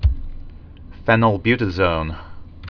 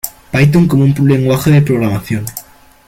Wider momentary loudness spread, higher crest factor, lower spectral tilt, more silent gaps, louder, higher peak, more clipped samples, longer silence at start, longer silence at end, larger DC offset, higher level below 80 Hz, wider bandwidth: first, 20 LU vs 10 LU; first, 20 dB vs 12 dB; first, -8.5 dB/octave vs -7 dB/octave; neither; second, -19 LUFS vs -12 LUFS; about the same, 0 dBFS vs 0 dBFS; neither; about the same, 0 s vs 0.05 s; second, 0.05 s vs 0.45 s; neither; first, -28 dBFS vs -38 dBFS; second, 5.4 kHz vs 17 kHz